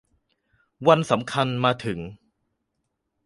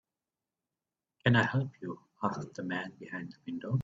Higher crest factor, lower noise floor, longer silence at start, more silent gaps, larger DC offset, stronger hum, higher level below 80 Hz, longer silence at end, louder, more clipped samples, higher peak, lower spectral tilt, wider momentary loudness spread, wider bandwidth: about the same, 24 dB vs 24 dB; second, -78 dBFS vs under -90 dBFS; second, 0.8 s vs 1.25 s; neither; neither; neither; first, -58 dBFS vs -66 dBFS; first, 1.1 s vs 0 s; first, -22 LUFS vs -33 LUFS; neither; first, -2 dBFS vs -10 dBFS; about the same, -6 dB/octave vs -7 dB/octave; about the same, 13 LU vs 15 LU; first, 11.5 kHz vs 7.8 kHz